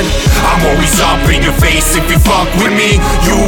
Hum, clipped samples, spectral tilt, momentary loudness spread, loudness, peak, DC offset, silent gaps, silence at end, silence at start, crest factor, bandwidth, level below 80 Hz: none; under 0.1%; -4 dB/octave; 1 LU; -10 LUFS; 0 dBFS; under 0.1%; none; 0 s; 0 s; 8 dB; 19.5 kHz; -14 dBFS